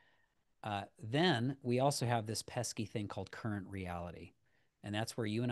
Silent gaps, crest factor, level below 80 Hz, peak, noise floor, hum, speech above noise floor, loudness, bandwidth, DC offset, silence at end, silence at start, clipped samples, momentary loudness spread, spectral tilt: none; 20 dB; -70 dBFS; -18 dBFS; -77 dBFS; none; 40 dB; -38 LUFS; 12.5 kHz; under 0.1%; 0 s; 0.65 s; under 0.1%; 12 LU; -5 dB/octave